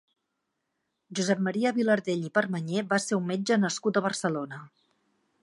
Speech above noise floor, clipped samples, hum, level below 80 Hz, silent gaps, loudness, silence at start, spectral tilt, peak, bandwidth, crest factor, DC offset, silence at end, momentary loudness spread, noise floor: 54 dB; under 0.1%; none; -78 dBFS; none; -28 LUFS; 1.1 s; -5 dB/octave; -10 dBFS; 11.5 kHz; 20 dB; under 0.1%; 0.75 s; 7 LU; -81 dBFS